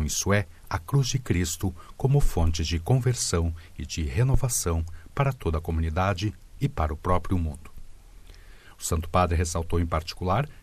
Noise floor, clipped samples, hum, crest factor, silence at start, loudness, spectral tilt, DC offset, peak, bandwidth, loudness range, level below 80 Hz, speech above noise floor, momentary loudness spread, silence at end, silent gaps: -47 dBFS; under 0.1%; none; 20 dB; 0 s; -27 LUFS; -5 dB/octave; under 0.1%; -6 dBFS; 14.5 kHz; 4 LU; -34 dBFS; 22 dB; 9 LU; 0 s; none